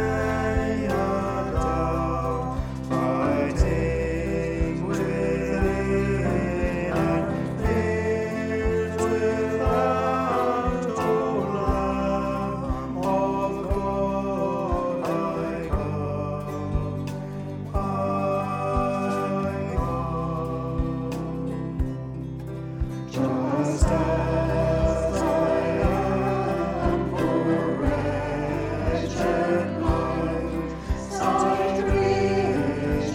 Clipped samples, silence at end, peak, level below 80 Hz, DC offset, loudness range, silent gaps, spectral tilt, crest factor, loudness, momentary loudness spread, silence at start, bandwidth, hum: under 0.1%; 0 s; -8 dBFS; -34 dBFS; under 0.1%; 4 LU; none; -7 dB/octave; 16 dB; -25 LUFS; 7 LU; 0 s; 16 kHz; none